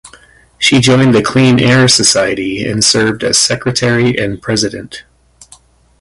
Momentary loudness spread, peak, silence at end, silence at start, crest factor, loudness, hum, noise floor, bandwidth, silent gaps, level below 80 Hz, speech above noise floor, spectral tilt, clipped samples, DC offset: 9 LU; 0 dBFS; 1 s; 0.05 s; 12 dB; -10 LUFS; none; -44 dBFS; 11.5 kHz; none; -42 dBFS; 33 dB; -3.5 dB/octave; under 0.1%; under 0.1%